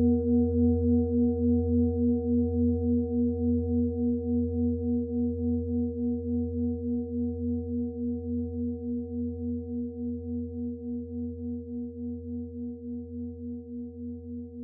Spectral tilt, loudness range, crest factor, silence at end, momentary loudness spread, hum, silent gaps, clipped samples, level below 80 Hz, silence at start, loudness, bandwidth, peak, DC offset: -16.5 dB/octave; 10 LU; 14 dB; 0 s; 13 LU; none; none; under 0.1%; -48 dBFS; 0 s; -30 LUFS; 0.8 kHz; -14 dBFS; under 0.1%